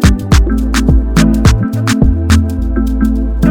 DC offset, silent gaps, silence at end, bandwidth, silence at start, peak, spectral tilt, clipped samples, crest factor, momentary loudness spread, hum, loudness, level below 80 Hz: under 0.1%; none; 0 s; 16.5 kHz; 0 s; 0 dBFS; -6 dB/octave; 1%; 10 dB; 4 LU; none; -12 LUFS; -14 dBFS